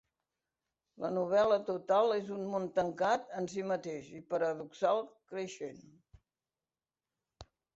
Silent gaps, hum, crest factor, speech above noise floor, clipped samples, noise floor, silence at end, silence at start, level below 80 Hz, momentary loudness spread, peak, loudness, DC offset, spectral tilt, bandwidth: none; none; 18 dB; over 56 dB; under 0.1%; under -90 dBFS; 0.35 s; 1 s; -72 dBFS; 13 LU; -18 dBFS; -34 LUFS; under 0.1%; -5.5 dB/octave; 8 kHz